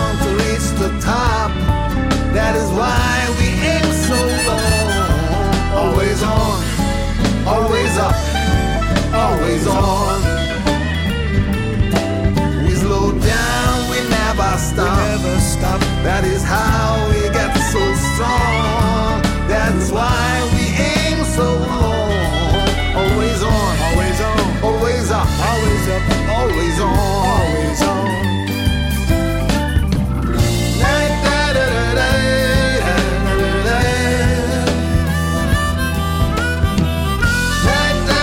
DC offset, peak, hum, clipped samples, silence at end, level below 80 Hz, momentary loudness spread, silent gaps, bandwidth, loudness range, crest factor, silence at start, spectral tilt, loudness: under 0.1%; 0 dBFS; none; under 0.1%; 0 s; -22 dBFS; 3 LU; none; 17 kHz; 1 LU; 16 dB; 0 s; -5 dB/octave; -16 LUFS